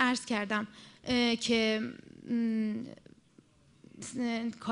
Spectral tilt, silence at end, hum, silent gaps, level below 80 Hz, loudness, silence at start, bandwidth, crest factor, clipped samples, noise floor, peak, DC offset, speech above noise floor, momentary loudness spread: -4 dB/octave; 0 s; none; none; -66 dBFS; -32 LUFS; 0 s; 11 kHz; 22 dB; under 0.1%; -63 dBFS; -12 dBFS; under 0.1%; 30 dB; 17 LU